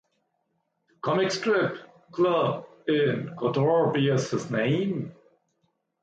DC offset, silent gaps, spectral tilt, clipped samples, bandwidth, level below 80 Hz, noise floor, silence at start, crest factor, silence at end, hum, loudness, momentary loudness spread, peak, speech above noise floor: under 0.1%; none; -6 dB/octave; under 0.1%; 9 kHz; -70 dBFS; -76 dBFS; 1.05 s; 14 dB; 0.9 s; none; -26 LUFS; 11 LU; -12 dBFS; 51 dB